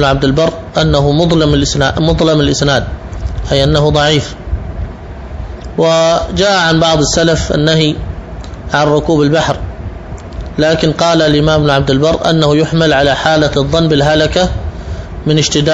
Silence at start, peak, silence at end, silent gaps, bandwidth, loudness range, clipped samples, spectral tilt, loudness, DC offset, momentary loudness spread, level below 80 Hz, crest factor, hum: 0 s; 0 dBFS; 0 s; none; 8 kHz; 4 LU; under 0.1%; -5 dB/octave; -11 LUFS; 0.3%; 15 LU; -24 dBFS; 12 dB; none